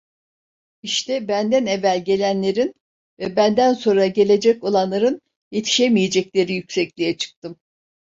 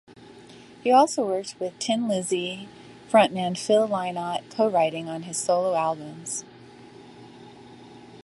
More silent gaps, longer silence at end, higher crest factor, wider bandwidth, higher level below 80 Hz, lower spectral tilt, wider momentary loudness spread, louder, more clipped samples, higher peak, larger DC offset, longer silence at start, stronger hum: first, 2.81-3.17 s, 5.36-5.51 s, 7.36-7.42 s vs none; first, 0.65 s vs 0 s; about the same, 16 dB vs 20 dB; second, 7.8 kHz vs 11.5 kHz; first, -62 dBFS vs -70 dBFS; about the same, -4.5 dB/octave vs -4 dB/octave; about the same, 11 LU vs 13 LU; first, -19 LUFS vs -24 LUFS; neither; about the same, -4 dBFS vs -4 dBFS; neither; first, 0.85 s vs 0.2 s; neither